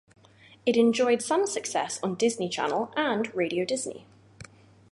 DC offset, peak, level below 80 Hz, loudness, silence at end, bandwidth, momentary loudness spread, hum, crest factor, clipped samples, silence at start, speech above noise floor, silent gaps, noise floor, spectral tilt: under 0.1%; -10 dBFS; -70 dBFS; -27 LUFS; 0.5 s; 11.5 kHz; 8 LU; none; 18 dB; under 0.1%; 0.65 s; 29 dB; none; -56 dBFS; -3.5 dB/octave